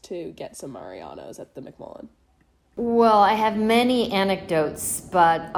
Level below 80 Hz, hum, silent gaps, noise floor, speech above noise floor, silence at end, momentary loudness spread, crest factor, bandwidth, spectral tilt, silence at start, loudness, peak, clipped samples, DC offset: -56 dBFS; none; none; -62 dBFS; 40 dB; 0 s; 23 LU; 18 dB; 16 kHz; -4 dB/octave; 0.1 s; -20 LUFS; -6 dBFS; under 0.1%; under 0.1%